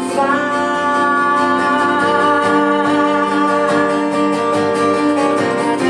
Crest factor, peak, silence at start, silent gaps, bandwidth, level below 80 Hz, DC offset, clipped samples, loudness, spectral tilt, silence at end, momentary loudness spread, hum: 12 dB; -2 dBFS; 0 s; none; 11.5 kHz; -64 dBFS; under 0.1%; under 0.1%; -14 LUFS; -5 dB/octave; 0 s; 3 LU; none